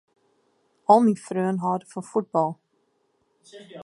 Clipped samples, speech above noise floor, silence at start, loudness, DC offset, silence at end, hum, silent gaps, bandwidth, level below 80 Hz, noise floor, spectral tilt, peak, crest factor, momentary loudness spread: under 0.1%; 47 dB; 0.9 s; -23 LUFS; under 0.1%; 0 s; none; none; 11.5 kHz; -76 dBFS; -70 dBFS; -7.5 dB/octave; -4 dBFS; 22 dB; 13 LU